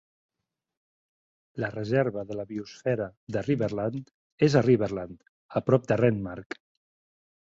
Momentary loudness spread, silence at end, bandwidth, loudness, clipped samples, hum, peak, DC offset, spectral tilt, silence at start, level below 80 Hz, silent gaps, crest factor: 17 LU; 1.1 s; 7.8 kHz; -27 LUFS; under 0.1%; none; -6 dBFS; under 0.1%; -7.5 dB/octave; 1.55 s; -60 dBFS; 3.17-3.27 s, 4.14-4.38 s, 5.29-5.49 s; 22 dB